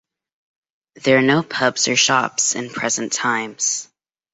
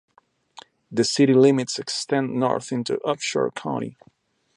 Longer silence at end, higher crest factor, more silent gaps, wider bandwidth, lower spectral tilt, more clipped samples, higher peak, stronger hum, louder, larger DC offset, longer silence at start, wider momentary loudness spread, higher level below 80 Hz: second, 0.5 s vs 0.65 s; about the same, 18 dB vs 18 dB; neither; second, 8.4 kHz vs 11.5 kHz; second, -2.5 dB/octave vs -5 dB/octave; neither; about the same, -2 dBFS vs -4 dBFS; neither; first, -18 LUFS vs -22 LUFS; neither; first, 1.05 s vs 0.9 s; second, 7 LU vs 12 LU; about the same, -64 dBFS vs -68 dBFS